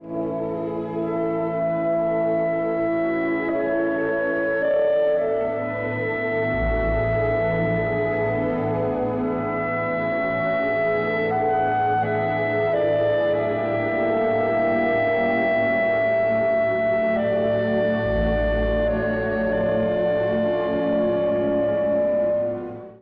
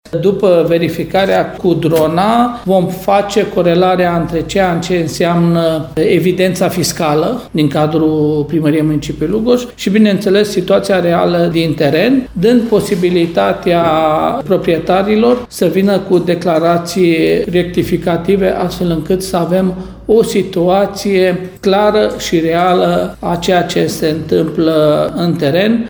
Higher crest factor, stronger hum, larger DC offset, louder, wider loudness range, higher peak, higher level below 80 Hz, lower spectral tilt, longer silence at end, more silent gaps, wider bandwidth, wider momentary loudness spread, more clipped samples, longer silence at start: about the same, 10 dB vs 12 dB; neither; neither; second, -22 LUFS vs -12 LUFS; about the same, 2 LU vs 2 LU; second, -12 dBFS vs 0 dBFS; about the same, -38 dBFS vs -38 dBFS; first, -9.5 dB/octave vs -6 dB/octave; about the same, 0.05 s vs 0 s; neither; second, 5 kHz vs over 20 kHz; about the same, 4 LU vs 4 LU; neither; about the same, 0 s vs 0.05 s